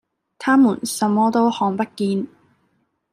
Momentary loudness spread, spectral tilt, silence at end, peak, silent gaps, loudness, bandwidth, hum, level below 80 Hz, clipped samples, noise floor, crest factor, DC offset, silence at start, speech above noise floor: 10 LU; -5 dB/octave; 0.85 s; -4 dBFS; none; -19 LUFS; 15 kHz; none; -68 dBFS; under 0.1%; -67 dBFS; 16 dB; under 0.1%; 0.4 s; 49 dB